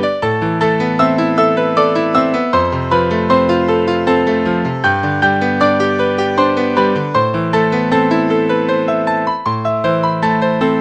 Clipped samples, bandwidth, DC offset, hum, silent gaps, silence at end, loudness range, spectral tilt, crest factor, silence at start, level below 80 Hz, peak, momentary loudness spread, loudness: under 0.1%; 9 kHz; under 0.1%; none; none; 0 s; 1 LU; -7 dB/octave; 14 dB; 0 s; -44 dBFS; 0 dBFS; 3 LU; -14 LUFS